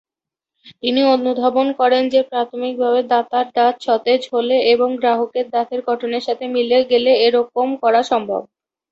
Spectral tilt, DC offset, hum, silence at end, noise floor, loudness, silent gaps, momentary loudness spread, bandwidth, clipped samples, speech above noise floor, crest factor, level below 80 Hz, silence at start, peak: -4.5 dB/octave; under 0.1%; none; 0.5 s; -87 dBFS; -17 LUFS; none; 7 LU; 7.8 kHz; under 0.1%; 71 dB; 14 dB; -66 dBFS; 0.65 s; -4 dBFS